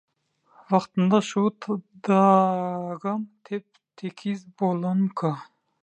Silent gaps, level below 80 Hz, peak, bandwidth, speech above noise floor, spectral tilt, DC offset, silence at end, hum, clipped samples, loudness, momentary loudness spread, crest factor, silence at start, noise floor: none; -76 dBFS; -6 dBFS; 8.6 kHz; 40 dB; -7.5 dB/octave; under 0.1%; 0.4 s; none; under 0.1%; -25 LUFS; 16 LU; 18 dB; 0.7 s; -64 dBFS